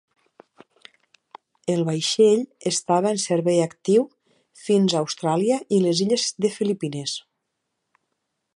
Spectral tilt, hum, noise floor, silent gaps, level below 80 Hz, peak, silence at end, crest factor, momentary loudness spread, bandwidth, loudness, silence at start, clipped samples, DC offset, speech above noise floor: -5 dB/octave; none; -78 dBFS; none; -74 dBFS; -6 dBFS; 1.35 s; 18 dB; 10 LU; 11.5 kHz; -22 LUFS; 1.65 s; under 0.1%; under 0.1%; 57 dB